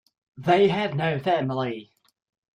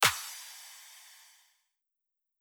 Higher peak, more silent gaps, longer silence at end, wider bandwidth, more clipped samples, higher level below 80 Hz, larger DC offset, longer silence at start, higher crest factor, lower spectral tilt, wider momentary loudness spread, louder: about the same, -8 dBFS vs -10 dBFS; neither; second, 0.7 s vs 1.35 s; second, 9.8 kHz vs over 20 kHz; neither; first, -64 dBFS vs -74 dBFS; neither; first, 0.35 s vs 0 s; second, 18 dB vs 26 dB; first, -7.5 dB/octave vs 0 dB/octave; second, 12 LU vs 20 LU; first, -24 LUFS vs -35 LUFS